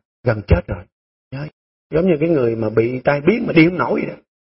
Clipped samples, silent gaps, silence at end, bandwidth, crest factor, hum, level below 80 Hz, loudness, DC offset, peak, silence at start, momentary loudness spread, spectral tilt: under 0.1%; 0.92-1.31 s, 1.53-1.90 s; 0.4 s; 5.8 kHz; 18 dB; none; -34 dBFS; -17 LUFS; under 0.1%; 0 dBFS; 0.25 s; 17 LU; -12 dB/octave